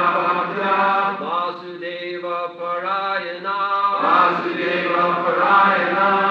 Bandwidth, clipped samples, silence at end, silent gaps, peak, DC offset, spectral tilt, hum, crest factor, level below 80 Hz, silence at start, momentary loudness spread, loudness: 6.8 kHz; under 0.1%; 0 s; none; -4 dBFS; under 0.1%; -6.5 dB/octave; none; 16 dB; -78 dBFS; 0 s; 11 LU; -19 LUFS